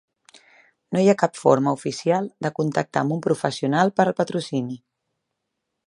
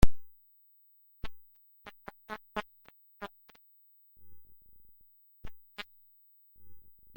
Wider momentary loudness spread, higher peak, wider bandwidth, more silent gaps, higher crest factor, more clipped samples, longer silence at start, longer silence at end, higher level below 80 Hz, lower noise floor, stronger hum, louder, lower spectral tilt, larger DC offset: second, 9 LU vs 18 LU; first, -2 dBFS vs -6 dBFS; second, 11.5 kHz vs 16.5 kHz; neither; about the same, 22 dB vs 26 dB; neither; first, 0.9 s vs 0 s; first, 1.1 s vs 0.35 s; second, -68 dBFS vs -42 dBFS; first, -80 dBFS vs -63 dBFS; neither; first, -22 LUFS vs -44 LUFS; about the same, -6 dB/octave vs -5.5 dB/octave; neither